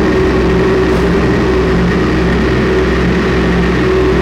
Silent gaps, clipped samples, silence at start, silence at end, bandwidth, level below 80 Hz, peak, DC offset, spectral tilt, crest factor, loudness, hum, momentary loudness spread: none; under 0.1%; 0 s; 0 s; 11 kHz; -20 dBFS; -4 dBFS; under 0.1%; -7 dB/octave; 6 dB; -11 LUFS; none; 1 LU